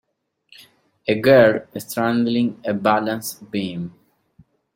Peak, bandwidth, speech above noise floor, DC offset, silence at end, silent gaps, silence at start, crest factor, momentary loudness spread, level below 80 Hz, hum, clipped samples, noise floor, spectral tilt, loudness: -2 dBFS; 16.5 kHz; 38 dB; under 0.1%; 0.85 s; none; 1.05 s; 20 dB; 15 LU; -62 dBFS; none; under 0.1%; -57 dBFS; -5.5 dB/octave; -19 LUFS